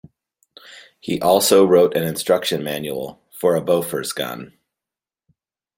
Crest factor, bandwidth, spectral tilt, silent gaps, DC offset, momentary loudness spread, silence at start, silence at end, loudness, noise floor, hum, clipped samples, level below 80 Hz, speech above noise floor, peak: 20 dB; 16.5 kHz; -4 dB/octave; none; under 0.1%; 16 LU; 0.7 s; 1.3 s; -18 LUFS; -89 dBFS; none; under 0.1%; -60 dBFS; 71 dB; -2 dBFS